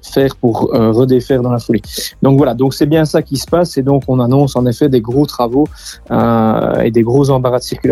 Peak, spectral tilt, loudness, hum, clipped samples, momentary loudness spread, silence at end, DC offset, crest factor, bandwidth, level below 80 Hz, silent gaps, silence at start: 0 dBFS; -7 dB/octave; -13 LUFS; none; under 0.1%; 5 LU; 0 s; under 0.1%; 12 dB; 15.5 kHz; -36 dBFS; none; 0.05 s